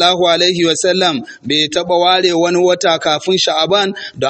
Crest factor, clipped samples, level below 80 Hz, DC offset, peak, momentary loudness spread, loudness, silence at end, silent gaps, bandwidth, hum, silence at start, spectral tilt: 14 dB; under 0.1%; -56 dBFS; under 0.1%; 0 dBFS; 4 LU; -13 LUFS; 0 s; none; 8.8 kHz; none; 0 s; -3 dB/octave